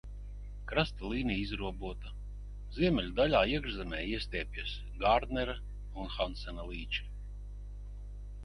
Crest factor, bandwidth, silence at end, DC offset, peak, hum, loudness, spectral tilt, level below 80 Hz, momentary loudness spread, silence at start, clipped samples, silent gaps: 22 dB; 10.5 kHz; 0 s; under 0.1%; -12 dBFS; 50 Hz at -40 dBFS; -34 LUFS; -6.5 dB/octave; -42 dBFS; 18 LU; 0.05 s; under 0.1%; none